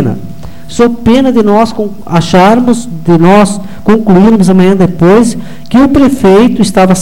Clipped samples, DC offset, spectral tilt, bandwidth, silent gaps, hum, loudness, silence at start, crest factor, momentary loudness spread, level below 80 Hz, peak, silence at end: 0.1%; 9%; -6.5 dB/octave; 16.5 kHz; none; none; -7 LUFS; 0 s; 8 dB; 9 LU; -30 dBFS; 0 dBFS; 0 s